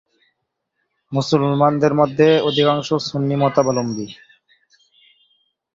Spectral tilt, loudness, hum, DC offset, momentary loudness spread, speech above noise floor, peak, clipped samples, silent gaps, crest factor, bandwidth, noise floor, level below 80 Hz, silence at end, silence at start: -6 dB/octave; -17 LUFS; none; under 0.1%; 11 LU; 58 dB; -2 dBFS; under 0.1%; none; 18 dB; 7.6 kHz; -75 dBFS; -58 dBFS; 1.6 s; 1.1 s